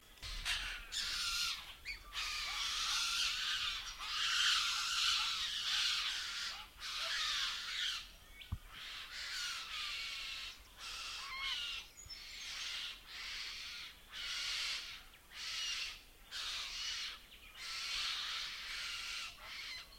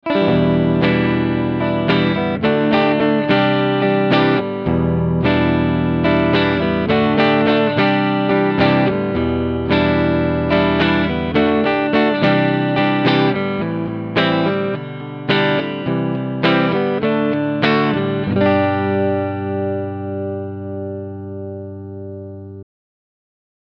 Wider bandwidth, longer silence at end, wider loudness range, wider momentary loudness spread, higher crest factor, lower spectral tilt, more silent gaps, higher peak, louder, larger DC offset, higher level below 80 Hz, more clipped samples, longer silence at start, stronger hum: first, 16.5 kHz vs 6.2 kHz; second, 0 s vs 1 s; first, 9 LU vs 6 LU; about the same, 14 LU vs 12 LU; first, 22 dB vs 16 dB; second, 1.5 dB/octave vs -8.5 dB/octave; neither; second, -20 dBFS vs -2 dBFS; second, -38 LUFS vs -17 LUFS; neither; second, -60 dBFS vs -40 dBFS; neither; about the same, 0 s vs 0.05 s; second, none vs 50 Hz at -45 dBFS